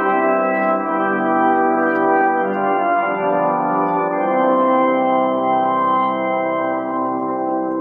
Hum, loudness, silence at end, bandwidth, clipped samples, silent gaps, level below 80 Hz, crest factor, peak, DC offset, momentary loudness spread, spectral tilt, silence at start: none; -17 LUFS; 0 s; 4.1 kHz; under 0.1%; none; -78 dBFS; 12 dB; -6 dBFS; under 0.1%; 5 LU; -9.5 dB/octave; 0 s